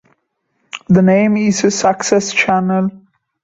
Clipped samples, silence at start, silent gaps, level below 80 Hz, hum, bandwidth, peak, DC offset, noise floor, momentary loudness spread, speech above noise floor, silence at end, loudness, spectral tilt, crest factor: under 0.1%; 0.75 s; none; -52 dBFS; none; 7.8 kHz; -2 dBFS; under 0.1%; -67 dBFS; 10 LU; 54 dB; 0.45 s; -14 LUFS; -5 dB/octave; 14 dB